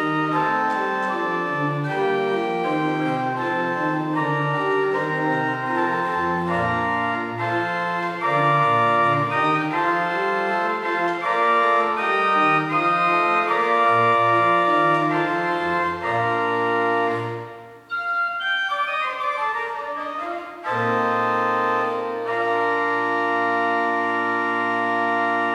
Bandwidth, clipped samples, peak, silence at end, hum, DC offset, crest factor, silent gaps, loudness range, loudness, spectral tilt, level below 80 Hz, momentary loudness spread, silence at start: 13 kHz; under 0.1%; -8 dBFS; 0 s; none; under 0.1%; 14 dB; none; 5 LU; -21 LUFS; -6 dB/octave; -64 dBFS; 7 LU; 0 s